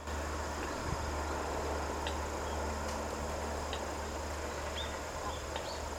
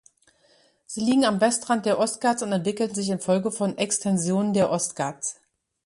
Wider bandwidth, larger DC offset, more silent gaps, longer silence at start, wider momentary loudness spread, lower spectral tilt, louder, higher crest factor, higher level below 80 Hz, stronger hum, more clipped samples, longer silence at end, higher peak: first, 17 kHz vs 11.5 kHz; neither; neither; second, 0 s vs 0.9 s; second, 3 LU vs 7 LU; about the same, -4 dB/octave vs -4.5 dB/octave; second, -38 LUFS vs -24 LUFS; about the same, 18 dB vs 16 dB; first, -44 dBFS vs -66 dBFS; neither; neither; second, 0 s vs 0.5 s; second, -20 dBFS vs -8 dBFS